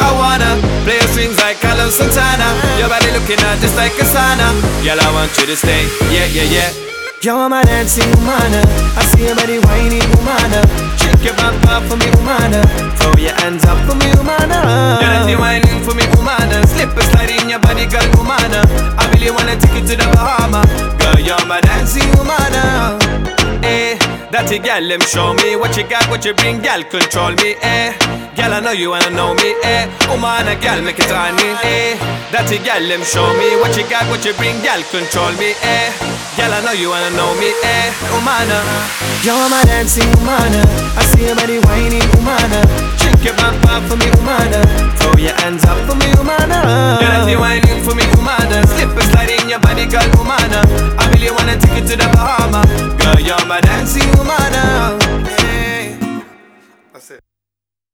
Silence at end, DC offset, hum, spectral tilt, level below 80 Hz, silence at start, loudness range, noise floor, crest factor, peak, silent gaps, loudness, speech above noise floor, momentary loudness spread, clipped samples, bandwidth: 0.75 s; under 0.1%; none; -4.5 dB/octave; -18 dBFS; 0 s; 3 LU; -86 dBFS; 12 dB; 0 dBFS; none; -11 LUFS; 76 dB; 4 LU; under 0.1%; over 20 kHz